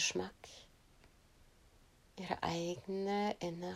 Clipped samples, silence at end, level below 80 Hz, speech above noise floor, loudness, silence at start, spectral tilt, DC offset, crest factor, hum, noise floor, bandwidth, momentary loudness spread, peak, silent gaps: under 0.1%; 0 s; -68 dBFS; 27 dB; -40 LUFS; 0 s; -3.5 dB/octave; under 0.1%; 22 dB; none; -66 dBFS; 16 kHz; 19 LU; -20 dBFS; none